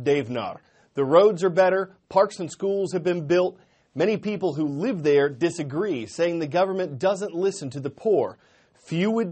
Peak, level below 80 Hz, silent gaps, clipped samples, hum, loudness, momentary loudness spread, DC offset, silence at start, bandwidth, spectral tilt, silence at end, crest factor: -4 dBFS; -68 dBFS; none; under 0.1%; none; -24 LUFS; 11 LU; under 0.1%; 0 s; 8.8 kHz; -6 dB/octave; 0 s; 20 dB